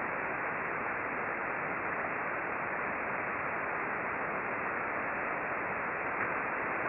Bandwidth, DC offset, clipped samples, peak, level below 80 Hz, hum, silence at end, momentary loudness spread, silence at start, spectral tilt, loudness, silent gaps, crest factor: 5.4 kHz; under 0.1%; under 0.1%; -20 dBFS; -66 dBFS; none; 0 s; 1 LU; 0 s; -9.5 dB/octave; -34 LUFS; none; 14 dB